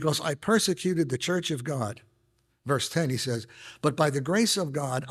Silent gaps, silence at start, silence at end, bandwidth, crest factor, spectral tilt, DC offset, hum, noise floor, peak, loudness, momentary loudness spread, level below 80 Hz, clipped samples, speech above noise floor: none; 0 s; 0 s; 15.5 kHz; 20 dB; -4.5 dB/octave; under 0.1%; none; -70 dBFS; -8 dBFS; -27 LUFS; 10 LU; -66 dBFS; under 0.1%; 43 dB